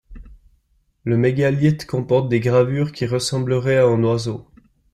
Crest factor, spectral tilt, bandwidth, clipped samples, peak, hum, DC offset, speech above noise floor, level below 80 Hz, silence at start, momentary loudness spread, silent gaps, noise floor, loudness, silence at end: 16 dB; -6.5 dB/octave; 13 kHz; under 0.1%; -4 dBFS; none; under 0.1%; 45 dB; -48 dBFS; 0.1 s; 8 LU; none; -63 dBFS; -19 LUFS; 0.5 s